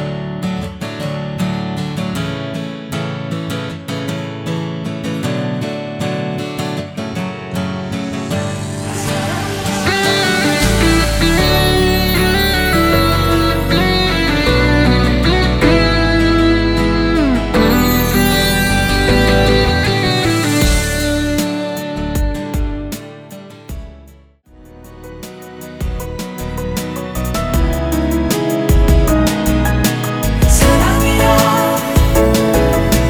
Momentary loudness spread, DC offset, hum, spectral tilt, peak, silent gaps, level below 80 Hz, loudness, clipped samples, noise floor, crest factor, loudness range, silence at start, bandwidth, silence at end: 11 LU; under 0.1%; none; -5 dB/octave; 0 dBFS; none; -22 dBFS; -15 LUFS; under 0.1%; -43 dBFS; 14 dB; 11 LU; 0 s; over 20 kHz; 0 s